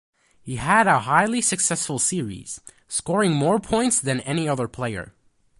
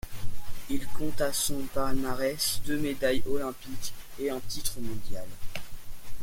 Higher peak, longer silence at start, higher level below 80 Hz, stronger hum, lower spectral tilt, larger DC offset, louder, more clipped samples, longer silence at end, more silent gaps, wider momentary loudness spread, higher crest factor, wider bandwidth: first, -4 dBFS vs -12 dBFS; first, 0.45 s vs 0.05 s; second, -52 dBFS vs -42 dBFS; neither; about the same, -4 dB/octave vs -3.5 dB/octave; neither; first, -21 LUFS vs -32 LUFS; neither; first, 0.5 s vs 0 s; neither; about the same, 16 LU vs 15 LU; first, 20 dB vs 12 dB; second, 11.5 kHz vs 17 kHz